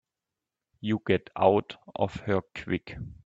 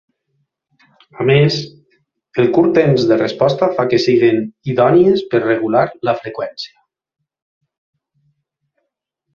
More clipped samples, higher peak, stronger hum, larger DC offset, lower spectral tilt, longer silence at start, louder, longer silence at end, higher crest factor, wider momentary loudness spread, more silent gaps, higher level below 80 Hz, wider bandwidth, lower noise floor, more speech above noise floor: neither; second, -6 dBFS vs 0 dBFS; neither; neither; about the same, -8 dB/octave vs -7 dB/octave; second, 0.85 s vs 1.2 s; second, -29 LUFS vs -14 LUFS; second, 0.1 s vs 2.7 s; first, 24 dB vs 16 dB; about the same, 12 LU vs 13 LU; neither; about the same, -58 dBFS vs -56 dBFS; about the same, 7.8 kHz vs 7.2 kHz; first, -88 dBFS vs -78 dBFS; second, 60 dB vs 64 dB